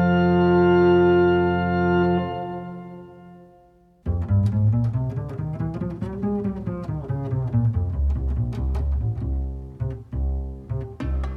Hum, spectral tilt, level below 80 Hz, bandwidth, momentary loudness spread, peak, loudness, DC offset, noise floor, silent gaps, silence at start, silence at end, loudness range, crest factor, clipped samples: none; -10 dB/octave; -32 dBFS; 6 kHz; 14 LU; -8 dBFS; -23 LUFS; under 0.1%; -54 dBFS; none; 0 s; 0 s; 6 LU; 14 dB; under 0.1%